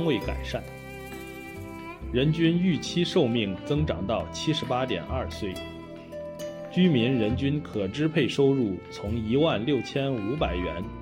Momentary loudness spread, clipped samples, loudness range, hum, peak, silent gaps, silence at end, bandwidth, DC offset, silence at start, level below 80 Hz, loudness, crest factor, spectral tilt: 16 LU; under 0.1%; 3 LU; none; -10 dBFS; none; 0 s; 16.5 kHz; under 0.1%; 0 s; -44 dBFS; -27 LUFS; 16 dB; -6.5 dB/octave